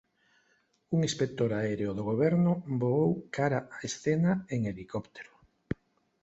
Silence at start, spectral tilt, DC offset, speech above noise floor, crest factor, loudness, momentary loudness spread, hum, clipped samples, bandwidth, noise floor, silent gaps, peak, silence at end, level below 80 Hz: 0.9 s; -6.5 dB/octave; under 0.1%; 42 dB; 18 dB; -30 LUFS; 13 LU; none; under 0.1%; 8.2 kHz; -71 dBFS; none; -14 dBFS; 0.5 s; -60 dBFS